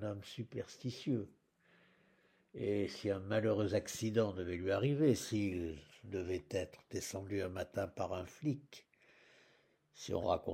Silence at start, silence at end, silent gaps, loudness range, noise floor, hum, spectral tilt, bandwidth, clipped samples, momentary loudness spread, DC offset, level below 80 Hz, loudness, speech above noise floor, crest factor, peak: 0 s; 0 s; none; 7 LU; -72 dBFS; none; -6 dB/octave; 16 kHz; under 0.1%; 12 LU; under 0.1%; -66 dBFS; -39 LUFS; 34 dB; 20 dB; -18 dBFS